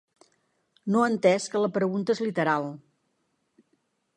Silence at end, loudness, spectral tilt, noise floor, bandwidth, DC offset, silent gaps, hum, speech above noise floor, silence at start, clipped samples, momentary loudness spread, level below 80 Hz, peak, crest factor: 1.4 s; -25 LUFS; -5.5 dB/octave; -74 dBFS; 11 kHz; under 0.1%; none; none; 50 dB; 0.85 s; under 0.1%; 14 LU; -78 dBFS; -8 dBFS; 20 dB